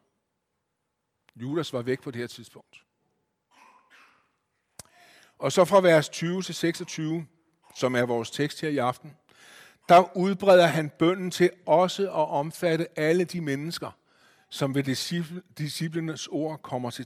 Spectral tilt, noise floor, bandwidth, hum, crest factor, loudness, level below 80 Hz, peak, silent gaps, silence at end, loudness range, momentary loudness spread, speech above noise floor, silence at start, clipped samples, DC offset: -5.5 dB/octave; -80 dBFS; 16 kHz; none; 20 dB; -25 LUFS; -70 dBFS; -6 dBFS; none; 0 s; 13 LU; 16 LU; 55 dB; 1.35 s; under 0.1%; under 0.1%